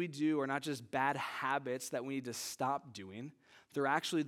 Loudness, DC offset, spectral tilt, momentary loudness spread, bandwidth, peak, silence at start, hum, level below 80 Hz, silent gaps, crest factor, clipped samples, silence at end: -37 LUFS; under 0.1%; -4 dB/octave; 14 LU; 17 kHz; -18 dBFS; 0 s; none; -86 dBFS; none; 20 dB; under 0.1%; 0 s